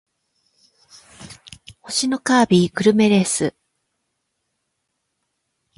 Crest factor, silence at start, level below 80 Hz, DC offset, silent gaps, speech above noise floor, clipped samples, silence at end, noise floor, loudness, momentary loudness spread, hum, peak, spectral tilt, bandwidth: 18 dB; 1.2 s; -58 dBFS; under 0.1%; none; 58 dB; under 0.1%; 2.25 s; -75 dBFS; -17 LUFS; 23 LU; none; -2 dBFS; -4.5 dB/octave; 11.5 kHz